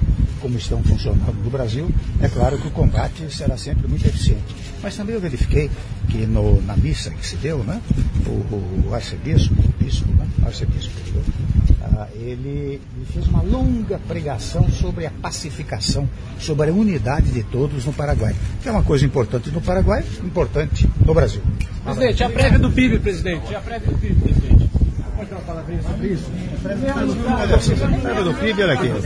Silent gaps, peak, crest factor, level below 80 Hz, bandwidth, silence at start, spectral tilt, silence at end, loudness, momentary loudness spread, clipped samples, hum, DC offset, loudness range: none; -2 dBFS; 16 dB; -22 dBFS; 10.5 kHz; 0 s; -7 dB/octave; 0 s; -20 LUFS; 10 LU; under 0.1%; none; under 0.1%; 4 LU